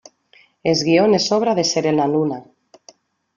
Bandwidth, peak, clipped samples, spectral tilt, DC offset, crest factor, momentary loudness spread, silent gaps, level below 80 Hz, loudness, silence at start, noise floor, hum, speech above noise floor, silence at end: 7.4 kHz; -2 dBFS; under 0.1%; -4.5 dB/octave; under 0.1%; 16 dB; 10 LU; none; -62 dBFS; -17 LUFS; 0.65 s; -55 dBFS; none; 38 dB; 0.95 s